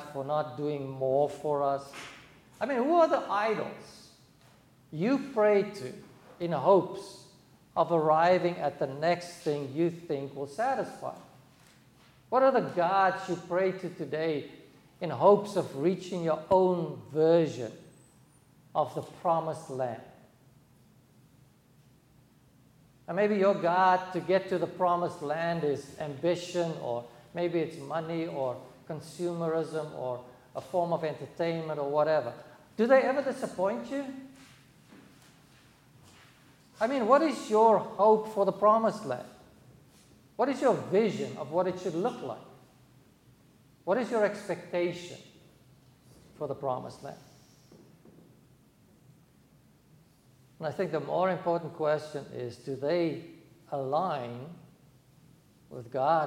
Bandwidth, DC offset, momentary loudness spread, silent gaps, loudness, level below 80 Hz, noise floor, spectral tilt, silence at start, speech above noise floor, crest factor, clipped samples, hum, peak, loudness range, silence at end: 16 kHz; under 0.1%; 17 LU; none; -29 LUFS; -72 dBFS; -61 dBFS; -6.5 dB/octave; 0 s; 33 dB; 22 dB; under 0.1%; none; -8 dBFS; 10 LU; 0 s